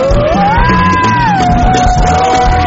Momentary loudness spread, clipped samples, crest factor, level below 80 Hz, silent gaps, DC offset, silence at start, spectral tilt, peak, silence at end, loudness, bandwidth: 1 LU; under 0.1%; 8 dB; -16 dBFS; none; under 0.1%; 0 s; -5.5 dB/octave; 0 dBFS; 0 s; -9 LUFS; 8 kHz